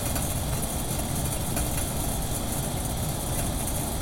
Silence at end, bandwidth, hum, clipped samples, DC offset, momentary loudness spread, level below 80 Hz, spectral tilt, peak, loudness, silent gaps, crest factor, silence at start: 0 s; 17 kHz; none; under 0.1%; under 0.1%; 2 LU; -34 dBFS; -4 dB/octave; -14 dBFS; -28 LUFS; none; 14 dB; 0 s